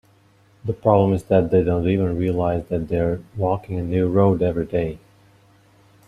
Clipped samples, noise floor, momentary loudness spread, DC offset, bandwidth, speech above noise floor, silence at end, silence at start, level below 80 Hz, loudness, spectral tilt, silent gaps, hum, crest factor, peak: under 0.1%; -55 dBFS; 8 LU; under 0.1%; 10 kHz; 36 dB; 1.1 s; 0.65 s; -44 dBFS; -21 LUFS; -9.5 dB/octave; none; none; 18 dB; -2 dBFS